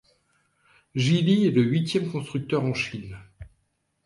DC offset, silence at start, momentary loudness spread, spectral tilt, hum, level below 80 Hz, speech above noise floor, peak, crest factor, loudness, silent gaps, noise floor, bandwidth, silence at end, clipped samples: under 0.1%; 0.95 s; 16 LU; -6.5 dB/octave; none; -56 dBFS; 50 dB; -10 dBFS; 16 dB; -24 LUFS; none; -73 dBFS; 11.5 kHz; 0.6 s; under 0.1%